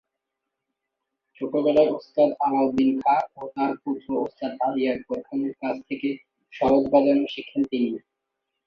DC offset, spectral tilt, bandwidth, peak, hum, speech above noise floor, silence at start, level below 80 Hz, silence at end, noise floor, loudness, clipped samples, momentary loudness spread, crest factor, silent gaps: under 0.1%; -7.5 dB/octave; 6.2 kHz; -6 dBFS; none; 60 dB; 1.4 s; -62 dBFS; 0.7 s; -83 dBFS; -24 LUFS; under 0.1%; 11 LU; 18 dB; none